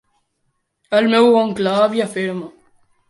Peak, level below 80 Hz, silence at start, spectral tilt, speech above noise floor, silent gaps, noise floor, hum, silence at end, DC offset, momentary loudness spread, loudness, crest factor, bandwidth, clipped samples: -2 dBFS; -64 dBFS; 0.9 s; -5.5 dB/octave; 54 dB; none; -70 dBFS; none; 0.6 s; under 0.1%; 13 LU; -16 LUFS; 16 dB; 11.5 kHz; under 0.1%